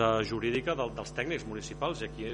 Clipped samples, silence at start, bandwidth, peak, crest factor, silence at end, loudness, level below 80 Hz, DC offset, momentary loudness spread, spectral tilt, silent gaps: under 0.1%; 0 s; 10.5 kHz; -12 dBFS; 20 dB; 0 s; -33 LUFS; -50 dBFS; under 0.1%; 6 LU; -5 dB/octave; none